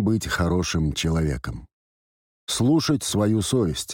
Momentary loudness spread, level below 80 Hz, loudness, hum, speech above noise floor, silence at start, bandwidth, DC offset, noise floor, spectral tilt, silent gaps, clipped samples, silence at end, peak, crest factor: 11 LU; -40 dBFS; -23 LUFS; none; over 68 dB; 0 s; 17 kHz; under 0.1%; under -90 dBFS; -5 dB/octave; 1.73-2.47 s; under 0.1%; 0 s; -12 dBFS; 12 dB